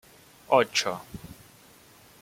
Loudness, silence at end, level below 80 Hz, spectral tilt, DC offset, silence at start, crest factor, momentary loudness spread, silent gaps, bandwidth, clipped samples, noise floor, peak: -25 LUFS; 0.9 s; -60 dBFS; -2.5 dB/octave; under 0.1%; 0.5 s; 24 dB; 22 LU; none; 16.5 kHz; under 0.1%; -55 dBFS; -6 dBFS